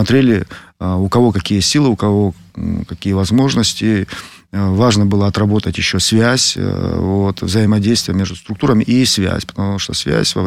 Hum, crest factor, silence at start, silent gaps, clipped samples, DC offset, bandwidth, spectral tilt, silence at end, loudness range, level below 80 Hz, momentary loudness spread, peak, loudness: none; 12 dB; 0 s; none; under 0.1%; under 0.1%; 15.5 kHz; -5 dB/octave; 0 s; 2 LU; -38 dBFS; 9 LU; -2 dBFS; -15 LUFS